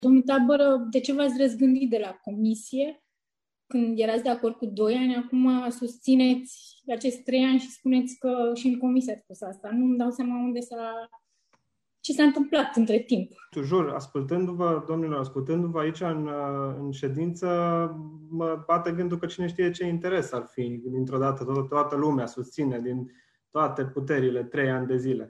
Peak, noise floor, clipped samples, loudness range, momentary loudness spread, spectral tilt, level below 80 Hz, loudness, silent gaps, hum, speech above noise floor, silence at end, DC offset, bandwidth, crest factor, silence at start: -8 dBFS; under -90 dBFS; under 0.1%; 4 LU; 11 LU; -6.5 dB/octave; -70 dBFS; -26 LUFS; none; none; over 64 dB; 0 s; under 0.1%; 11.5 kHz; 16 dB; 0 s